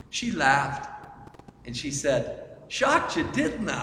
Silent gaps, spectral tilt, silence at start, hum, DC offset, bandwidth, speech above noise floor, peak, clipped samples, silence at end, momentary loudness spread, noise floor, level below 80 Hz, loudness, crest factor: none; -3.5 dB/octave; 0.1 s; none; under 0.1%; 14.5 kHz; 22 dB; -6 dBFS; under 0.1%; 0 s; 19 LU; -48 dBFS; -52 dBFS; -26 LUFS; 22 dB